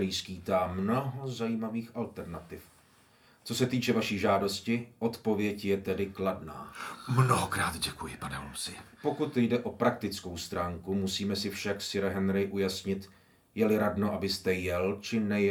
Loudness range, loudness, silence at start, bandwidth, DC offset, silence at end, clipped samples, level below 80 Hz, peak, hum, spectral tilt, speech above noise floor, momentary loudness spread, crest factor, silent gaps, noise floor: 3 LU; -31 LUFS; 0 s; 19.5 kHz; under 0.1%; 0 s; under 0.1%; -60 dBFS; -12 dBFS; none; -5.5 dB/octave; 31 dB; 11 LU; 20 dB; none; -62 dBFS